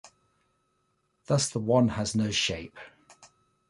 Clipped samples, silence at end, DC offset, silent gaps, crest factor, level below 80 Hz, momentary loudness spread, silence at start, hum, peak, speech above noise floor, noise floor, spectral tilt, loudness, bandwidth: under 0.1%; 0.45 s; under 0.1%; none; 20 dB; -56 dBFS; 16 LU; 0.05 s; none; -10 dBFS; 47 dB; -74 dBFS; -4.5 dB/octave; -27 LUFS; 11.5 kHz